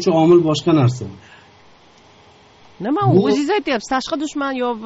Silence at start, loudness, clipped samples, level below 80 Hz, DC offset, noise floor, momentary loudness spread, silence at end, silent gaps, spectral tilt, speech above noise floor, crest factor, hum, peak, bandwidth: 0 s; -17 LUFS; under 0.1%; -56 dBFS; under 0.1%; -48 dBFS; 11 LU; 0 s; none; -6 dB/octave; 32 dB; 16 dB; none; -2 dBFS; 8 kHz